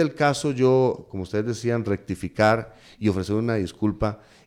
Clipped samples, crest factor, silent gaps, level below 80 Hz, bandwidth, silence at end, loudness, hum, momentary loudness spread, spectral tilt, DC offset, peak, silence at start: under 0.1%; 16 dB; none; -48 dBFS; 14.5 kHz; 0.3 s; -24 LUFS; none; 9 LU; -6.5 dB/octave; under 0.1%; -8 dBFS; 0 s